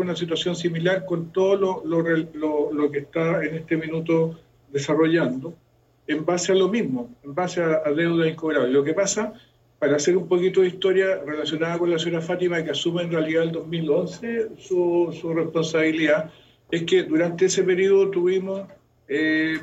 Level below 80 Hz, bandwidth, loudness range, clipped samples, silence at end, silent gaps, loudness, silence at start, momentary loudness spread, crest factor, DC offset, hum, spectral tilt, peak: -64 dBFS; 8.2 kHz; 2 LU; under 0.1%; 0 s; none; -23 LUFS; 0 s; 8 LU; 16 dB; under 0.1%; none; -5 dB/octave; -8 dBFS